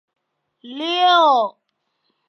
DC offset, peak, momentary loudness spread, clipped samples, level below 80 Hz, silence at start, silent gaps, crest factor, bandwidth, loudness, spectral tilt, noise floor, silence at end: under 0.1%; -2 dBFS; 14 LU; under 0.1%; -88 dBFS; 0.65 s; none; 18 dB; 6.6 kHz; -16 LUFS; -2 dB/octave; -72 dBFS; 0.8 s